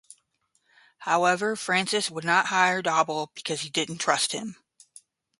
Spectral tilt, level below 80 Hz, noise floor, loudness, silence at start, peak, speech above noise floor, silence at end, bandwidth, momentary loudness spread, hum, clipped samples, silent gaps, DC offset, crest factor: -2.5 dB/octave; -76 dBFS; -72 dBFS; -25 LUFS; 1 s; -6 dBFS; 47 dB; 0.85 s; 12 kHz; 9 LU; none; under 0.1%; none; under 0.1%; 22 dB